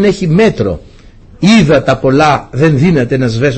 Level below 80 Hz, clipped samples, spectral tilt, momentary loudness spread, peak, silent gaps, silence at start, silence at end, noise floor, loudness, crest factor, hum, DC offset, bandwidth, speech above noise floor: -32 dBFS; under 0.1%; -6.5 dB/octave; 7 LU; 0 dBFS; none; 0 s; 0 s; -36 dBFS; -10 LUFS; 10 dB; none; under 0.1%; 8.6 kHz; 27 dB